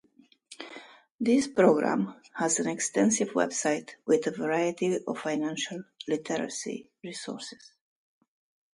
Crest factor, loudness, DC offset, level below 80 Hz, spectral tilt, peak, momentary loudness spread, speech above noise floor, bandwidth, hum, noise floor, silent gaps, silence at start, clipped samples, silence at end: 22 dB; -28 LUFS; under 0.1%; -74 dBFS; -4 dB/octave; -8 dBFS; 16 LU; 31 dB; 11.5 kHz; none; -59 dBFS; 1.11-1.19 s; 0.5 s; under 0.1%; 1.2 s